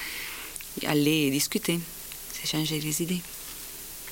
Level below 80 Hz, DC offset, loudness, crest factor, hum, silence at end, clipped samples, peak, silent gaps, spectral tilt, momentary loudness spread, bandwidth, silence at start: -54 dBFS; under 0.1%; -29 LUFS; 20 dB; none; 0 s; under 0.1%; -10 dBFS; none; -3.5 dB/octave; 14 LU; 17 kHz; 0 s